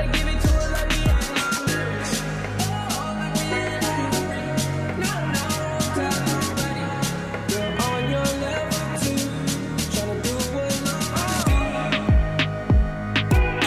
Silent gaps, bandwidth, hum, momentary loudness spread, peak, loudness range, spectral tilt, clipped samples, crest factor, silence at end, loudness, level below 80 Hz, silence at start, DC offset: none; 15.5 kHz; none; 5 LU; -10 dBFS; 2 LU; -4.5 dB/octave; under 0.1%; 12 dB; 0 s; -23 LUFS; -28 dBFS; 0 s; under 0.1%